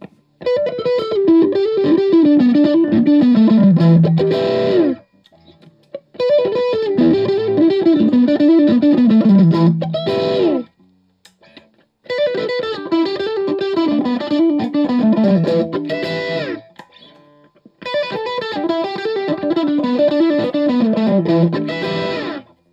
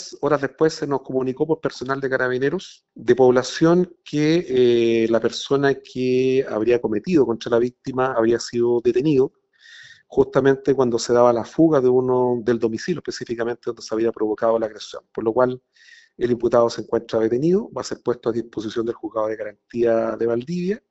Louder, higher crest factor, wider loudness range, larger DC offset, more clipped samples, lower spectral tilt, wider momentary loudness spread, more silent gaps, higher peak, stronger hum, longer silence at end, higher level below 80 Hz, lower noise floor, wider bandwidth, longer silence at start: first, -15 LUFS vs -21 LUFS; second, 12 dB vs 18 dB; first, 9 LU vs 5 LU; neither; neither; first, -9 dB/octave vs -5.5 dB/octave; about the same, 10 LU vs 10 LU; neither; about the same, -2 dBFS vs -2 dBFS; neither; first, 0.3 s vs 0.15 s; about the same, -60 dBFS vs -56 dBFS; first, -55 dBFS vs -47 dBFS; about the same, 7.4 kHz vs 8 kHz; first, 0.4 s vs 0 s